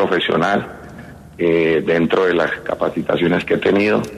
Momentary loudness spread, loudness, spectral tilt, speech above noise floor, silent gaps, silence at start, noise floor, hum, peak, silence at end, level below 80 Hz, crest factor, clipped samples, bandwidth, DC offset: 11 LU; -17 LUFS; -6.5 dB/octave; 20 dB; none; 0 s; -37 dBFS; none; -4 dBFS; 0 s; -48 dBFS; 14 dB; under 0.1%; 13 kHz; under 0.1%